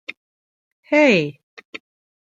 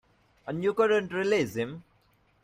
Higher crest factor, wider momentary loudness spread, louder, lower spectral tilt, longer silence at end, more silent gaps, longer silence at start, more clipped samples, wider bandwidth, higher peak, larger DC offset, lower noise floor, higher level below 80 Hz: about the same, 20 dB vs 16 dB; first, 24 LU vs 16 LU; first, -17 LUFS vs -28 LUFS; about the same, -5.5 dB/octave vs -5.5 dB/octave; second, 0.45 s vs 0.65 s; first, 0.17-0.83 s, 1.43-1.57 s, 1.65-1.73 s vs none; second, 0.1 s vs 0.45 s; neither; second, 7.8 kHz vs 15.5 kHz; first, -2 dBFS vs -12 dBFS; neither; first, under -90 dBFS vs -66 dBFS; about the same, -70 dBFS vs -66 dBFS